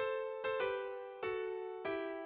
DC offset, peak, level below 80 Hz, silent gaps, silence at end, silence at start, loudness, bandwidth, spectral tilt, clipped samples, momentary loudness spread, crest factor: under 0.1%; -24 dBFS; -76 dBFS; none; 0 s; 0 s; -40 LUFS; 4.8 kHz; -2 dB/octave; under 0.1%; 5 LU; 14 dB